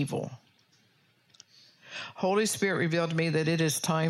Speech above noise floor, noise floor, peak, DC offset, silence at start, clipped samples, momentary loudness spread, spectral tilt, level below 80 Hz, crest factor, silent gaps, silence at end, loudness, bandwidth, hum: 38 dB; -67 dBFS; -14 dBFS; under 0.1%; 0 s; under 0.1%; 14 LU; -4.5 dB/octave; -74 dBFS; 16 dB; none; 0 s; -28 LUFS; 16 kHz; none